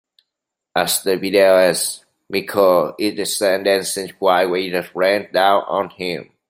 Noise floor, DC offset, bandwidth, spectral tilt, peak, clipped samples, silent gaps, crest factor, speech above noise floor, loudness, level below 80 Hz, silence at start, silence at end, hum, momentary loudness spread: -82 dBFS; under 0.1%; 16 kHz; -3 dB/octave; -2 dBFS; under 0.1%; none; 16 dB; 65 dB; -17 LUFS; -64 dBFS; 0.75 s; 0.25 s; none; 10 LU